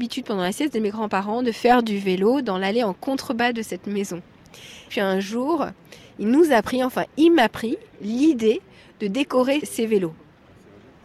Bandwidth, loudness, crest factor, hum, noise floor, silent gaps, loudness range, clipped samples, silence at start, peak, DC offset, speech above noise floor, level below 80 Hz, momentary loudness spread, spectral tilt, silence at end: 14 kHz; -22 LUFS; 16 dB; none; -50 dBFS; none; 5 LU; under 0.1%; 0 s; -6 dBFS; under 0.1%; 28 dB; -60 dBFS; 11 LU; -5 dB/octave; 0.9 s